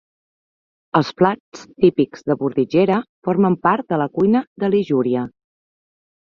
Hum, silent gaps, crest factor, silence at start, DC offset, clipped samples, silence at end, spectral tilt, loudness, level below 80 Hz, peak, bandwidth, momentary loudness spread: none; 1.40-1.52 s, 3.09-3.22 s, 4.47-4.56 s; 18 dB; 0.95 s; under 0.1%; under 0.1%; 0.9 s; -8 dB/octave; -19 LUFS; -60 dBFS; -2 dBFS; 7.2 kHz; 5 LU